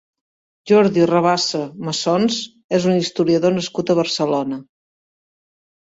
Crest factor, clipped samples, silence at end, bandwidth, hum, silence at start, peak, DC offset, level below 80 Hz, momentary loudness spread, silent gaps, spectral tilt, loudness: 16 dB; under 0.1%; 1.25 s; 8 kHz; none; 0.65 s; -2 dBFS; under 0.1%; -60 dBFS; 9 LU; 2.64-2.69 s; -5 dB/octave; -18 LUFS